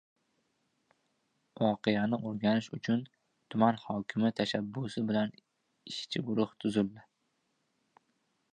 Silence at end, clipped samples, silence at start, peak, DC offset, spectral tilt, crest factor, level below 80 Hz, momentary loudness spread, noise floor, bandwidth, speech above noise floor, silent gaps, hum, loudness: 1.5 s; under 0.1%; 1.6 s; -12 dBFS; under 0.1%; -6.5 dB/octave; 22 dB; -72 dBFS; 8 LU; -79 dBFS; 9.8 kHz; 47 dB; none; none; -33 LUFS